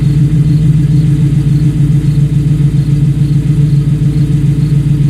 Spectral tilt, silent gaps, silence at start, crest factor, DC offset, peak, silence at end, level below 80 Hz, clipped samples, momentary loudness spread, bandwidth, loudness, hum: -9 dB/octave; none; 0 s; 8 dB; under 0.1%; 0 dBFS; 0 s; -22 dBFS; under 0.1%; 2 LU; 9.8 kHz; -10 LUFS; none